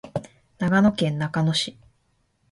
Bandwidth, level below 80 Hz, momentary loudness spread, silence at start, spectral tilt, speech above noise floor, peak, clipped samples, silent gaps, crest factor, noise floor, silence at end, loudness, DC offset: 11.5 kHz; -56 dBFS; 13 LU; 0.05 s; -5.5 dB/octave; 46 dB; -6 dBFS; under 0.1%; none; 18 dB; -68 dBFS; 0.8 s; -23 LUFS; under 0.1%